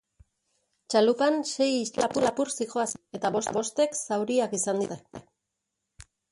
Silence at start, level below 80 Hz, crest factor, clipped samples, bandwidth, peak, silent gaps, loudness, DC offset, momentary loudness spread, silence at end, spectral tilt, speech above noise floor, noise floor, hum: 0.9 s; -66 dBFS; 20 dB; under 0.1%; 11.5 kHz; -10 dBFS; none; -27 LUFS; under 0.1%; 8 LU; 1.1 s; -3.5 dB/octave; 56 dB; -83 dBFS; none